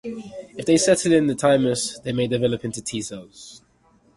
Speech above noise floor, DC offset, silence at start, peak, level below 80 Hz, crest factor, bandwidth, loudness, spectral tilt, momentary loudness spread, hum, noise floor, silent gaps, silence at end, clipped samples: 37 dB; under 0.1%; 0.05 s; -4 dBFS; -56 dBFS; 18 dB; 11.5 kHz; -21 LUFS; -4.5 dB/octave; 20 LU; none; -59 dBFS; none; 0.6 s; under 0.1%